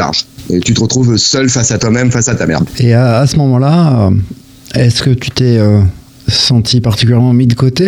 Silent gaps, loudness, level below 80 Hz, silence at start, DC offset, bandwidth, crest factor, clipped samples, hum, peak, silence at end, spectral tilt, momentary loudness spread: none; -10 LUFS; -34 dBFS; 0 s; under 0.1%; 13.5 kHz; 10 dB; under 0.1%; none; 0 dBFS; 0 s; -5 dB/octave; 6 LU